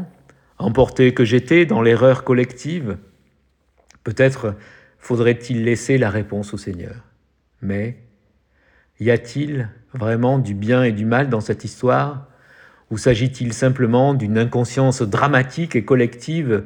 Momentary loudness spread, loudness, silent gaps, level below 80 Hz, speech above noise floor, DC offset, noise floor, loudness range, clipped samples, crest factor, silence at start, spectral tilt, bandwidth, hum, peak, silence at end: 14 LU; -18 LUFS; none; -48 dBFS; 44 dB; under 0.1%; -62 dBFS; 8 LU; under 0.1%; 18 dB; 0 s; -7 dB/octave; 10.5 kHz; none; 0 dBFS; 0 s